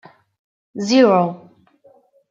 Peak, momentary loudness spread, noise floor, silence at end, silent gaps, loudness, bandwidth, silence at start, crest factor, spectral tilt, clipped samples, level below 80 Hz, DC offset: -2 dBFS; 23 LU; -53 dBFS; 0.95 s; none; -16 LUFS; 7.8 kHz; 0.75 s; 18 dB; -5.5 dB/octave; under 0.1%; -68 dBFS; under 0.1%